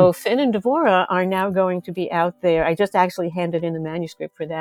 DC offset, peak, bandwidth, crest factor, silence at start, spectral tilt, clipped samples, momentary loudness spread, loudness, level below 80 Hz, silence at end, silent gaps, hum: under 0.1%; -2 dBFS; 16 kHz; 18 dB; 0 s; -6.5 dB/octave; under 0.1%; 10 LU; -20 LUFS; -52 dBFS; 0 s; none; none